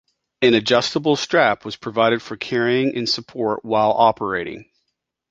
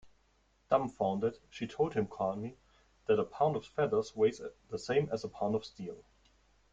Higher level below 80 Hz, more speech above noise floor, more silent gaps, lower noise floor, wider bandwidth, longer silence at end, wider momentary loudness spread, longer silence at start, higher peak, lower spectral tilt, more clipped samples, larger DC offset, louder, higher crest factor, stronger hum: first, -58 dBFS vs -68 dBFS; first, 57 dB vs 38 dB; neither; first, -76 dBFS vs -71 dBFS; about the same, 7.8 kHz vs 7.8 kHz; about the same, 0.7 s vs 0.7 s; second, 9 LU vs 13 LU; first, 0.4 s vs 0.05 s; first, 0 dBFS vs -12 dBFS; second, -4.5 dB/octave vs -6.5 dB/octave; neither; neither; first, -19 LUFS vs -34 LUFS; about the same, 20 dB vs 22 dB; neither